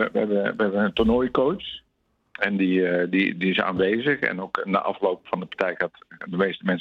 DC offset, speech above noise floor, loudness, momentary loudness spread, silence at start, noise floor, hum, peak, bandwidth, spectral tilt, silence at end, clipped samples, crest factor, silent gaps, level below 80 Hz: under 0.1%; 24 dB; -24 LUFS; 9 LU; 0 s; -47 dBFS; none; -4 dBFS; 6.2 kHz; -8 dB/octave; 0 s; under 0.1%; 20 dB; none; -50 dBFS